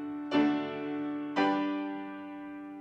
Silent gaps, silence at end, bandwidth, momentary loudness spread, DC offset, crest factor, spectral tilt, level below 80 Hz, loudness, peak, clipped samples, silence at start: none; 0 s; 6.6 kHz; 14 LU; under 0.1%; 16 dB; -6.5 dB/octave; -76 dBFS; -32 LUFS; -16 dBFS; under 0.1%; 0 s